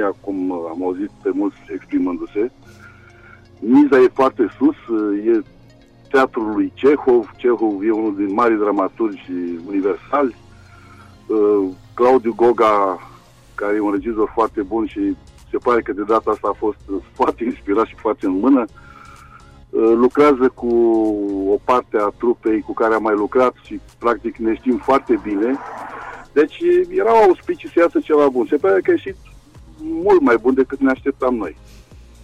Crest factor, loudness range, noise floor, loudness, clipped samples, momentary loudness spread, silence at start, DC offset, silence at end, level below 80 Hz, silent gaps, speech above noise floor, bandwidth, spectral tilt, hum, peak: 12 dB; 4 LU; -46 dBFS; -17 LUFS; under 0.1%; 11 LU; 0 s; under 0.1%; 0.25 s; -48 dBFS; none; 30 dB; 9.2 kHz; -7 dB/octave; none; -6 dBFS